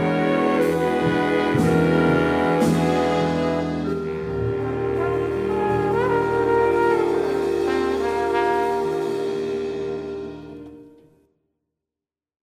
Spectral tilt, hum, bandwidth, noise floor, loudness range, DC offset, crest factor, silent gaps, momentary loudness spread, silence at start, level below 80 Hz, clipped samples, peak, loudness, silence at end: -7 dB/octave; none; 15.5 kHz; -89 dBFS; 7 LU; under 0.1%; 14 dB; none; 8 LU; 0 s; -46 dBFS; under 0.1%; -8 dBFS; -21 LUFS; 1.55 s